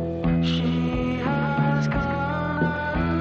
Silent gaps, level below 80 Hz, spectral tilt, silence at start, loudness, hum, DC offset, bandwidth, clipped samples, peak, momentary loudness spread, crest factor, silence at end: none; -38 dBFS; -7.5 dB/octave; 0 s; -24 LUFS; none; under 0.1%; 7 kHz; under 0.1%; -10 dBFS; 3 LU; 12 dB; 0 s